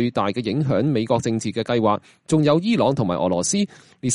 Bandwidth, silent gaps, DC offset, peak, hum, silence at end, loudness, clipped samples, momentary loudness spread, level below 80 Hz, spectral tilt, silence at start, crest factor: 11.5 kHz; none; under 0.1%; -6 dBFS; none; 0 s; -21 LUFS; under 0.1%; 6 LU; -56 dBFS; -5.5 dB/octave; 0 s; 16 dB